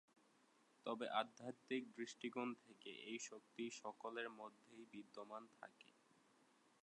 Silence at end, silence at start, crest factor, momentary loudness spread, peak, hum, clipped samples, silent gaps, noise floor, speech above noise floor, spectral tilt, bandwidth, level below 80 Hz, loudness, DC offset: 0.95 s; 0.85 s; 26 dB; 16 LU; -26 dBFS; none; under 0.1%; none; -76 dBFS; 25 dB; -3 dB/octave; 11 kHz; under -90 dBFS; -51 LUFS; under 0.1%